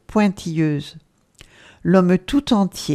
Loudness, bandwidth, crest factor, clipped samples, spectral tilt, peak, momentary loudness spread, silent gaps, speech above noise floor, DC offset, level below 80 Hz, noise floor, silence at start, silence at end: -19 LUFS; 14 kHz; 20 dB; under 0.1%; -6.5 dB/octave; 0 dBFS; 12 LU; none; 32 dB; under 0.1%; -46 dBFS; -50 dBFS; 0.1 s; 0 s